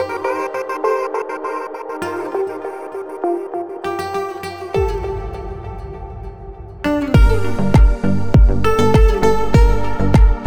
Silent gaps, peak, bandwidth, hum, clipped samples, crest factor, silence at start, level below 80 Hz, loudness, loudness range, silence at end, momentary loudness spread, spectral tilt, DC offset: none; 0 dBFS; 13 kHz; none; under 0.1%; 16 dB; 0 s; -20 dBFS; -18 LUFS; 9 LU; 0 s; 16 LU; -7.5 dB/octave; under 0.1%